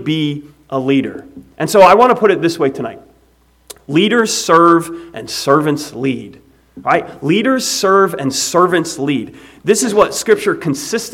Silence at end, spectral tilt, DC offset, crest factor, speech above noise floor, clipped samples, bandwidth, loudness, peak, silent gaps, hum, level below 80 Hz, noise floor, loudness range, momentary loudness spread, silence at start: 0 s; -4 dB/octave; under 0.1%; 14 dB; 39 dB; 0.2%; 16.5 kHz; -13 LUFS; 0 dBFS; none; none; -52 dBFS; -52 dBFS; 2 LU; 15 LU; 0 s